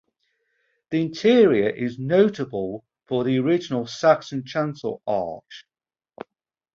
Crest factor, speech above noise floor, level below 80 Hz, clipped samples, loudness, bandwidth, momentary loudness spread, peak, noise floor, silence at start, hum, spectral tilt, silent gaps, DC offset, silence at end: 20 dB; over 69 dB; -64 dBFS; under 0.1%; -22 LUFS; 7.6 kHz; 20 LU; -4 dBFS; under -90 dBFS; 0.9 s; none; -6.5 dB/octave; none; under 0.1%; 1.15 s